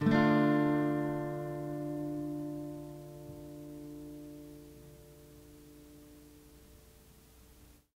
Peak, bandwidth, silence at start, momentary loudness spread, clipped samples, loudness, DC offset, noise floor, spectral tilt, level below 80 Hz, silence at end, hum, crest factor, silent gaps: -14 dBFS; 16 kHz; 0 s; 28 LU; under 0.1%; -33 LUFS; under 0.1%; -59 dBFS; -7.5 dB/octave; -62 dBFS; 0.3 s; none; 22 dB; none